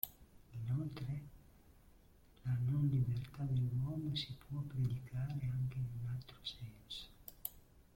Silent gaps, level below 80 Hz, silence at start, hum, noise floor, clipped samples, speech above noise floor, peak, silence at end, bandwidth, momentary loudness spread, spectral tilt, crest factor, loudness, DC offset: none; -60 dBFS; 0.05 s; none; -65 dBFS; under 0.1%; 23 dB; -18 dBFS; 0.15 s; 16.5 kHz; 12 LU; -6.5 dB/octave; 24 dB; -41 LUFS; under 0.1%